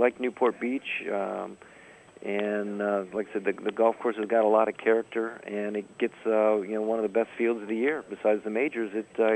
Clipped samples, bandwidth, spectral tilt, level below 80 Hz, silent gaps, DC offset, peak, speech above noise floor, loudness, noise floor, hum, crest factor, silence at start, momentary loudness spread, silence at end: under 0.1%; 8.4 kHz; -6.5 dB/octave; -74 dBFS; none; under 0.1%; -8 dBFS; 23 dB; -28 LUFS; -50 dBFS; none; 18 dB; 0 s; 9 LU; 0 s